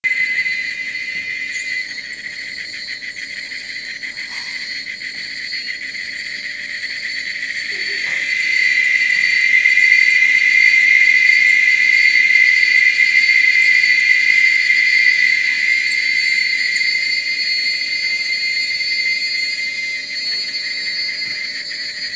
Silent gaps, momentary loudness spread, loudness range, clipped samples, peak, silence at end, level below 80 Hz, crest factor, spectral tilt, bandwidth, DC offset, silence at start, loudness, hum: none; 16 LU; 14 LU; under 0.1%; 0 dBFS; 0 s; -64 dBFS; 16 dB; 1.5 dB/octave; 8 kHz; under 0.1%; 0.05 s; -13 LUFS; none